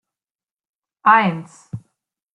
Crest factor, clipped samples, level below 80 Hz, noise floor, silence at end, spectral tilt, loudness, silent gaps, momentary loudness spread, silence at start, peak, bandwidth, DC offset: 20 dB; under 0.1%; -64 dBFS; under -90 dBFS; 0.55 s; -6 dB/octave; -16 LUFS; none; 22 LU; 1.05 s; -2 dBFS; 11 kHz; under 0.1%